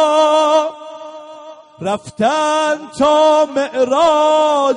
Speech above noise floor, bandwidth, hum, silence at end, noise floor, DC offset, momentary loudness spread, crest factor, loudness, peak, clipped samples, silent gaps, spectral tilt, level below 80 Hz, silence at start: 22 dB; 10.5 kHz; none; 0 s; -36 dBFS; under 0.1%; 20 LU; 12 dB; -14 LUFS; -2 dBFS; under 0.1%; none; -3.5 dB/octave; -56 dBFS; 0 s